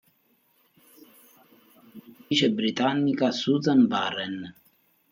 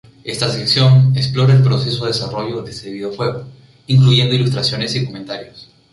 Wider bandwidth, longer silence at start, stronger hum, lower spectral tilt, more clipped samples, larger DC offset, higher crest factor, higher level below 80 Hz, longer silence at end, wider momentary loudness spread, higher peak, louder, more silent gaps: first, 16 kHz vs 11.5 kHz; first, 1.95 s vs 0.25 s; neither; about the same, -5.5 dB/octave vs -6 dB/octave; neither; neither; about the same, 18 dB vs 14 dB; second, -74 dBFS vs -48 dBFS; first, 0.6 s vs 0.3 s; second, 12 LU vs 16 LU; second, -10 dBFS vs -2 dBFS; second, -24 LUFS vs -15 LUFS; neither